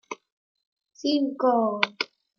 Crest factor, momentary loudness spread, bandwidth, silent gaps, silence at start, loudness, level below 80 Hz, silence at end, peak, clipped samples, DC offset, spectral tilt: 26 dB; 15 LU; 7.2 kHz; 0.32-0.55 s, 0.67-0.76 s; 0.1 s; -25 LUFS; -82 dBFS; 0.35 s; -2 dBFS; under 0.1%; under 0.1%; -4 dB/octave